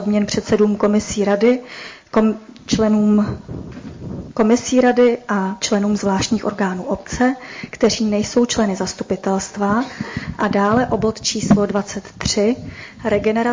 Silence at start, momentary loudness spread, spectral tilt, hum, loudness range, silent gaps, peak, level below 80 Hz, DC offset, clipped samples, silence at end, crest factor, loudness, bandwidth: 0 s; 13 LU; -5 dB/octave; none; 2 LU; none; -4 dBFS; -42 dBFS; under 0.1%; under 0.1%; 0 s; 14 dB; -18 LUFS; 7.6 kHz